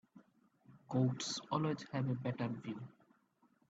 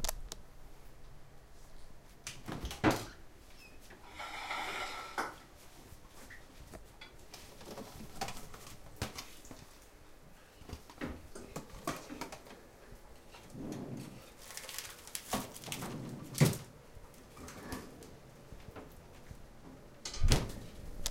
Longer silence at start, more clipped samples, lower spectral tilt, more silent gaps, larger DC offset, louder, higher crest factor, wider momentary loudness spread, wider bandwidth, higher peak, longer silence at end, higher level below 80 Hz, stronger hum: first, 0.15 s vs 0 s; neither; first, -6 dB/octave vs -4.5 dB/octave; neither; neither; about the same, -39 LUFS vs -41 LUFS; second, 18 dB vs 34 dB; second, 11 LU vs 24 LU; second, 8 kHz vs 16.5 kHz; second, -22 dBFS vs -8 dBFS; first, 0.8 s vs 0 s; second, -78 dBFS vs -48 dBFS; neither